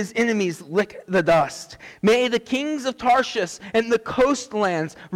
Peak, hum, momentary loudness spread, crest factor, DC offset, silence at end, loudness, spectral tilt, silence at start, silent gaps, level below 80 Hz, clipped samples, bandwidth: -10 dBFS; none; 8 LU; 10 dB; under 0.1%; 0 s; -22 LUFS; -4.5 dB/octave; 0 s; none; -54 dBFS; under 0.1%; 16 kHz